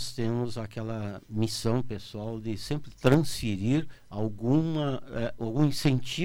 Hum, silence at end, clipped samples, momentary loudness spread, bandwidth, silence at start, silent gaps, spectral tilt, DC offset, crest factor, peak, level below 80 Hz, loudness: none; 0 s; under 0.1%; 11 LU; 16.5 kHz; 0 s; none; -6.5 dB/octave; under 0.1%; 22 dB; -6 dBFS; -50 dBFS; -29 LUFS